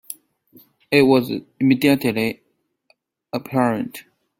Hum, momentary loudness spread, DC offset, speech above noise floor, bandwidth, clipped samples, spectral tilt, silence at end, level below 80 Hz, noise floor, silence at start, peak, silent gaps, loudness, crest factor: none; 21 LU; under 0.1%; 45 dB; 17 kHz; under 0.1%; -6 dB/octave; 0.4 s; -60 dBFS; -64 dBFS; 0.1 s; -2 dBFS; none; -19 LUFS; 18 dB